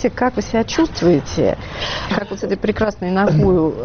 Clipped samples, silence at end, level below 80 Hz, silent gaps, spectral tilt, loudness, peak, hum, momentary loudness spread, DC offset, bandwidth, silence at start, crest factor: under 0.1%; 0 s; -36 dBFS; none; -5.5 dB/octave; -18 LUFS; -4 dBFS; none; 8 LU; under 0.1%; 6.8 kHz; 0 s; 14 dB